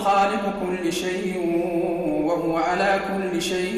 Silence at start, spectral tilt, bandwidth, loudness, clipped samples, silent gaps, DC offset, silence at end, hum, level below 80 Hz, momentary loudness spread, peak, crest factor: 0 s; -5 dB/octave; 14 kHz; -23 LUFS; under 0.1%; none; under 0.1%; 0 s; none; -52 dBFS; 5 LU; -10 dBFS; 12 dB